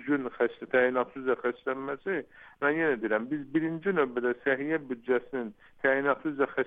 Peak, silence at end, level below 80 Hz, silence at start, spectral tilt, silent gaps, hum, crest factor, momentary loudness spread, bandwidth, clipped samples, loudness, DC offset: -12 dBFS; 0 s; -68 dBFS; 0 s; -8.5 dB/octave; none; none; 18 dB; 7 LU; 3.9 kHz; under 0.1%; -29 LUFS; under 0.1%